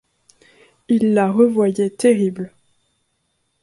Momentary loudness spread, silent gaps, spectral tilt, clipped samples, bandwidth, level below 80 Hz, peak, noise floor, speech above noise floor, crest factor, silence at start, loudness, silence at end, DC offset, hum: 10 LU; none; -7 dB/octave; under 0.1%; 11.5 kHz; -64 dBFS; -4 dBFS; -69 dBFS; 53 dB; 16 dB; 0.9 s; -17 LUFS; 1.15 s; under 0.1%; none